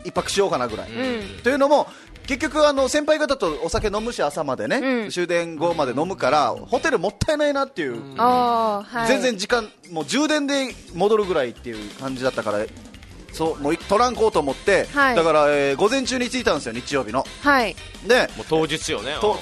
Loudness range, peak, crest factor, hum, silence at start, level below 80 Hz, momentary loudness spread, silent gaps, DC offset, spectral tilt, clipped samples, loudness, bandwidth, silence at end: 4 LU; -4 dBFS; 18 dB; none; 0 s; -44 dBFS; 9 LU; none; under 0.1%; -4 dB/octave; under 0.1%; -21 LUFS; 12.5 kHz; 0 s